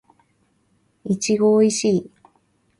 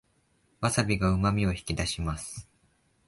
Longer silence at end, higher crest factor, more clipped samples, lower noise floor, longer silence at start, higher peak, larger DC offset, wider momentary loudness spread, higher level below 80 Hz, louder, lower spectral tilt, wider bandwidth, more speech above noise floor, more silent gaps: about the same, 0.75 s vs 0.65 s; about the same, 16 dB vs 20 dB; neither; second, -64 dBFS vs -69 dBFS; first, 1.05 s vs 0.6 s; first, -6 dBFS vs -10 dBFS; neither; about the same, 10 LU vs 12 LU; second, -64 dBFS vs -42 dBFS; first, -19 LUFS vs -28 LUFS; about the same, -5 dB/octave vs -5 dB/octave; about the same, 11.5 kHz vs 11.5 kHz; first, 46 dB vs 41 dB; neither